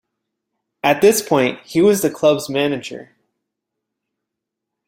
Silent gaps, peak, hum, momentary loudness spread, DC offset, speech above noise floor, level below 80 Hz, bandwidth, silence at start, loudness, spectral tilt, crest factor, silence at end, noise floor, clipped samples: none; -2 dBFS; none; 11 LU; under 0.1%; 65 dB; -62 dBFS; 16 kHz; 0.85 s; -17 LUFS; -4.5 dB/octave; 18 dB; 1.85 s; -81 dBFS; under 0.1%